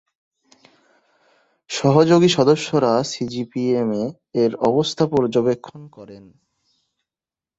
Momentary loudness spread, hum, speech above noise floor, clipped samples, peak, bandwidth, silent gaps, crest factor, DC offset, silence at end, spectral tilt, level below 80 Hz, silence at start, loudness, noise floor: 13 LU; none; over 71 dB; under 0.1%; -2 dBFS; 8.2 kHz; none; 18 dB; under 0.1%; 1.4 s; -6 dB/octave; -60 dBFS; 1.7 s; -19 LUFS; under -90 dBFS